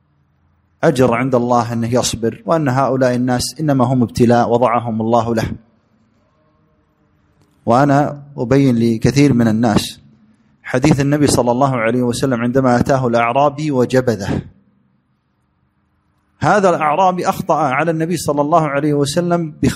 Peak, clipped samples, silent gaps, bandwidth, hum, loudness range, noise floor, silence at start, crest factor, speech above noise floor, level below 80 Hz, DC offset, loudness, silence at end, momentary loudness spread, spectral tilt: 0 dBFS; under 0.1%; none; 15.5 kHz; none; 4 LU; -63 dBFS; 0.8 s; 16 dB; 48 dB; -44 dBFS; under 0.1%; -15 LUFS; 0 s; 6 LU; -6 dB/octave